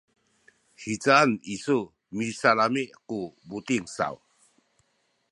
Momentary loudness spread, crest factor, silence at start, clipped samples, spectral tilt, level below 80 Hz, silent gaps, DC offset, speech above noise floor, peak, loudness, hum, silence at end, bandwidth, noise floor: 17 LU; 24 dB; 0.8 s; under 0.1%; -4.5 dB/octave; -68 dBFS; none; under 0.1%; 46 dB; -4 dBFS; -26 LUFS; none; 1.15 s; 11.5 kHz; -72 dBFS